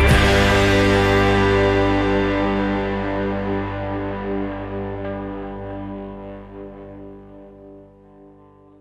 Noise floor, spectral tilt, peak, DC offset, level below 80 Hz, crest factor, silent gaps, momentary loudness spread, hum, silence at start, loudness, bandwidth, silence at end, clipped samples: -48 dBFS; -6 dB/octave; -4 dBFS; under 0.1%; -30 dBFS; 16 dB; none; 21 LU; 50 Hz at -45 dBFS; 0 s; -19 LUFS; 15 kHz; 0.95 s; under 0.1%